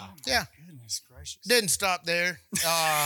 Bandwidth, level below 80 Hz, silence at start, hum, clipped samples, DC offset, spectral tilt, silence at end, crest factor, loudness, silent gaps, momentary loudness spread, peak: 19 kHz; -56 dBFS; 0 s; none; under 0.1%; under 0.1%; -1.5 dB/octave; 0 s; 20 dB; -26 LUFS; none; 14 LU; -8 dBFS